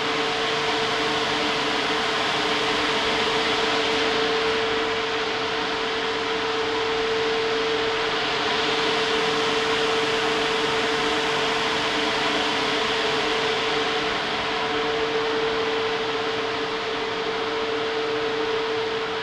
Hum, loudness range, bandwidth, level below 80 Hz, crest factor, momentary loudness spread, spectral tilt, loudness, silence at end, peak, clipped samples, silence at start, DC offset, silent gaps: none; 3 LU; 12.5 kHz; -52 dBFS; 14 dB; 4 LU; -2.5 dB/octave; -23 LUFS; 0 s; -10 dBFS; under 0.1%; 0 s; under 0.1%; none